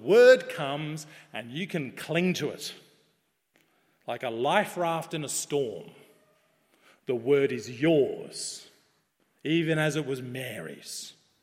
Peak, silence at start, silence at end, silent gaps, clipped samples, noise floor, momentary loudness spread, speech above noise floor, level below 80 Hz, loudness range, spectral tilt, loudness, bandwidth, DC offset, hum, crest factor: -6 dBFS; 0 s; 0.3 s; none; under 0.1%; -73 dBFS; 15 LU; 46 dB; -76 dBFS; 5 LU; -4.5 dB/octave; -28 LUFS; 16 kHz; under 0.1%; none; 22 dB